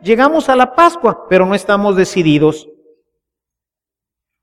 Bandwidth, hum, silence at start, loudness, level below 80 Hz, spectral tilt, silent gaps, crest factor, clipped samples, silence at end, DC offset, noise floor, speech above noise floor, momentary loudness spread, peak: 13.5 kHz; none; 0.05 s; -12 LUFS; -48 dBFS; -6 dB/octave; none; 14 dB; under 0.1%; 1.8 s; under 0.1%; -87 dBFS; 75 dB; 4 LU; 0 dBFS